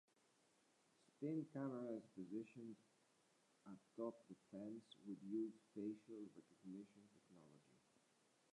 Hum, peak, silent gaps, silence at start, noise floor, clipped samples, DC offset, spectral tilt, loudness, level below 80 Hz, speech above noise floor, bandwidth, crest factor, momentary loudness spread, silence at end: none; -36 dBFS; none; 1.2 s; -80 dBFS; under 0.1%; under 0.1%; -7.5 dB/octave; -53 LUFS; under -90 dBFS; 28 dB; 11 kHz; 18 dB; 16 LU; 0.75 s